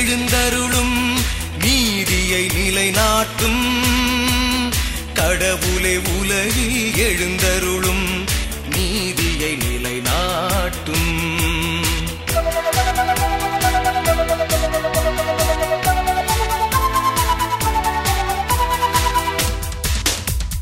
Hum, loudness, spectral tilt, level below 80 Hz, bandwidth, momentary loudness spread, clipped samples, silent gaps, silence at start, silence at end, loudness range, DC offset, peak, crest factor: none; -18 LUFS; -3.5 dB/octave; -26 dBFS; 16.5 kHz; 4 LU; under 0.1%; none; 0 s; 0 s; 3 LU; under 0.1%; -2 dBFS; 16 dB